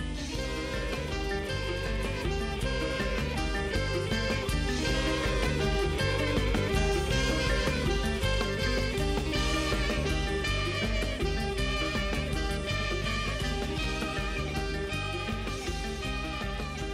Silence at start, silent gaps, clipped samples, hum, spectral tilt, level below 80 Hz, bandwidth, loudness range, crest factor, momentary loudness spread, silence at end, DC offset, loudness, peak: 0 s; none; under 0.1%; none; -4.5 dB/octave; -34 dBFS; 15 kHz; 4 LU; 12 dB; 5 LU; 0 s; under 0.1%; -30 LUFS; -16 dBFS